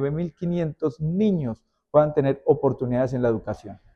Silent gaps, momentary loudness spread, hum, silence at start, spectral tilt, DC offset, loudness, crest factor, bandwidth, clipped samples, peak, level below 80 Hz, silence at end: none; 10 LU; none; 0 s; -9.5 dB/octave; under 0.1%; -24 LUFS; 18 dB; 7.6 kHz; under 0.1%; -6 dBFS; -52 dBFS; 0.2 s